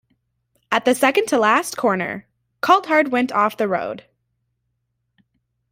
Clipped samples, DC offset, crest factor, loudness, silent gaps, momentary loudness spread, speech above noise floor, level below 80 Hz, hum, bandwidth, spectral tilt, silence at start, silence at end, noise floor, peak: under 0.1%; under 0.1%; 20 dB; -18 LUFS; none; 11 LU; 55 dB; -66 dBFS; none; 16 kHz; -4 dB/octave; 0.7 s; 1.7 s; -73 dBFS; -2 dBFS